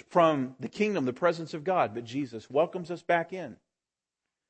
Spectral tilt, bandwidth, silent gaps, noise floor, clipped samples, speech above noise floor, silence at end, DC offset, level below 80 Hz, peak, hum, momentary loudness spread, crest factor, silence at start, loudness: -6.5 dB/octave; 8.8 kHz; none; under -90 dBFS; under 0.1%; over 61 dB; 0.95 s; under 0.1%; -76 dBFS; -10 dBFS; none; 11 LU; 20 dB; 0.1 s; -29 LUFS